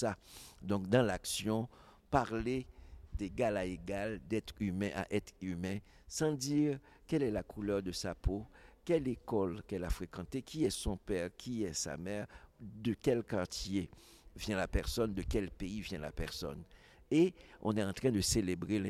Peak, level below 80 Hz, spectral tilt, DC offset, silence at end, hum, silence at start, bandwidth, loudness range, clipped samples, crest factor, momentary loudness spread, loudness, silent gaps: -16 dBFS; -50 dBFS; -5 dB/octave; under 0.1%; 0 s; none; 0 s; 15.5 kHz; 3 LU; under 0.1%; 22 dB; 11 LU; -37 LUFS; none